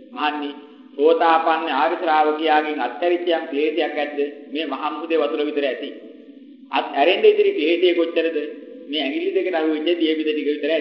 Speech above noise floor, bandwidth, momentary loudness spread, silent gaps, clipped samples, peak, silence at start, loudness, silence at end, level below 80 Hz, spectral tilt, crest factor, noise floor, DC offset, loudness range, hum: 23 dB; 5.8 kHz; 11 LU; none; under 0.1%; -2 dBFS; 0 s; -20 LUFS; 0 s; -82 dBFS; -5.5 dB/octave; 18 dB; -43 dBFS; under 0.1%; 4 LU; none